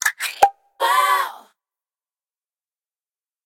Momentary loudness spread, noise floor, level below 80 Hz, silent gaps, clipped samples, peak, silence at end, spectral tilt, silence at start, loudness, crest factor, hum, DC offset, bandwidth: 7 LU; under -90 dBFS; -68 dBFS; none; under 0.1%; 0 dBFS; 2.1 s; 1 dB/octave; 0 s; -19 LUFS; 24 dB; none; under 0.1%; 17 kHz